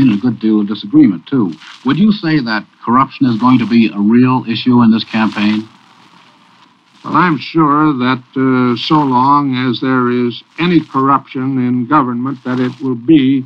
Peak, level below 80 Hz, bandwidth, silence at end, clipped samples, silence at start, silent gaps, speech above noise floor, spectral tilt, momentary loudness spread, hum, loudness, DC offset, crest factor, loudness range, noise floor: 0 dBFS; -52 dBFS; 6.4 kHz; 0 s; under 0.1%; 0 s; none; 35 dB; -8 dB/octave; 7 LU; none; -13 LUFS; under 0.1%; 12 dB; 3 LU; -47 dBFS